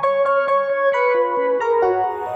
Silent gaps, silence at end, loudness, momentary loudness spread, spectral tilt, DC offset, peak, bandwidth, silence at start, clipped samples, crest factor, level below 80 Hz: none; 0 s; -18 LUFS; 2 LU; -5 dB/octave; under 0.1%; -8 dBFS; 7.6 kHz; 0 s; under 0.1%; 10 dB; -62 dBFS